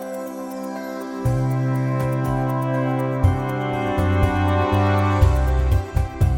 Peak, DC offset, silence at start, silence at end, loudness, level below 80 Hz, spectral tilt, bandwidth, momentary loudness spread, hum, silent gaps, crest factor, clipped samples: -4 dBFS; under 0.1%; 0 s; 0 s; -21 LUFS; -28 dBFS; -8 dB/octave; 17 kHz; 11 LU; none; none; 16 dB; under 0.1%